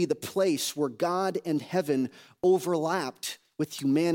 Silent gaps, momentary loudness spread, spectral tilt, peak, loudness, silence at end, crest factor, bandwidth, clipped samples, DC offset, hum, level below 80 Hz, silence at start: none; 9 LU; -5 dB/octave; -14 dBFS; -29 LUFS; 0 s; 14 dB; 17 kHz; under 0.1%; under 0.1%; none; -76 dBFS; 0 s